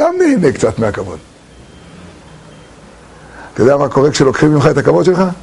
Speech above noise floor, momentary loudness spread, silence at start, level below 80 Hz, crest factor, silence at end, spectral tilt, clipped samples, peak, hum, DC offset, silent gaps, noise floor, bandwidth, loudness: 27 dB; 14 LU; 0 s; -42 dBFS; 14 dB; 0 s; -6.5 dB/octave; under 0.1%; 0 dBFS; none; under 0.1%; none; -39 dBFS; 11.5 kHz; -12 LUFS